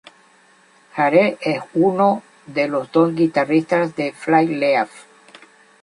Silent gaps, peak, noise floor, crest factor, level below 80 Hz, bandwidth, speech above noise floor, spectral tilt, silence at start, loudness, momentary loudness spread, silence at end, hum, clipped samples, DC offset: none; -2 dBFS; -53 dBFS; 18 dB; -66 dBFS; 11 kHz; 35 dB; -7 dB/octave; 0.95 s; -18 LUFS; 9 LU; 0.8 s; none; under 0.1%; under 0.1%